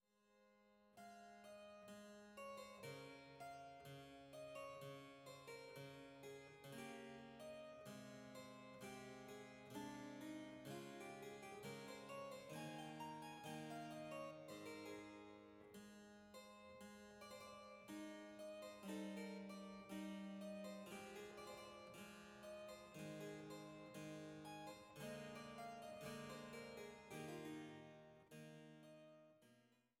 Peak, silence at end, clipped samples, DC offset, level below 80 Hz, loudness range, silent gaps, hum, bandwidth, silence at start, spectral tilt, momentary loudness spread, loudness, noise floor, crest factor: -40 dBFS; 0.2 s; under 0.1%; under 0.1%; -84 dBFS; 5 LU; none; none; 17 kHz; 0.2 s; -4.5 dB/octave; 8 LU; -56 LUFS; -78 dBFS; 16 dB